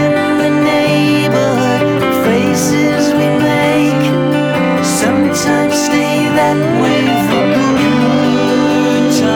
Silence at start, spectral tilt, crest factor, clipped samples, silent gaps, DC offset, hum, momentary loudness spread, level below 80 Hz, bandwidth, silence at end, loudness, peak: 0 s; -5 dB/octave; 10 dB; under 0.1%; none; under 0.1%; none; 1 LU; -46 dBFS; 19.5 kHz; 0 s; -12 LUFS; -2 dBFS